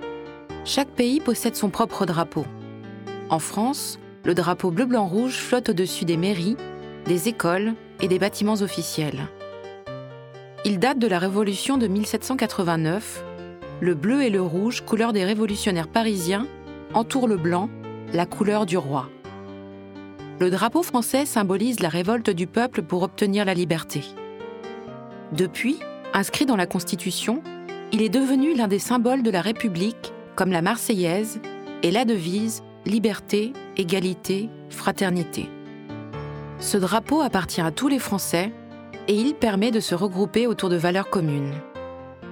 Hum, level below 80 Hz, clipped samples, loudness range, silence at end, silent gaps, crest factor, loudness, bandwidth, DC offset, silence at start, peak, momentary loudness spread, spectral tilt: none; -58 dBFS; under 0.1%; 3 LU; 0 s; none; 20 dB; -23 LUFS; over 20 kHz; under 0.1%; 0 s; -2 dBFS; 15 LU; -5 dB/octave